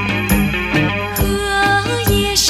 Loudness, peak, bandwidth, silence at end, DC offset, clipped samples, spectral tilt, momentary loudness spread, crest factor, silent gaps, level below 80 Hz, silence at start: -16 LUFS; 0 dBFS; 19 kHz; 0 s; under 0.1%; under 0.1%; -3.5 dB/octave; 4 LU; 16 dB; none; -26 dBFS; 0 s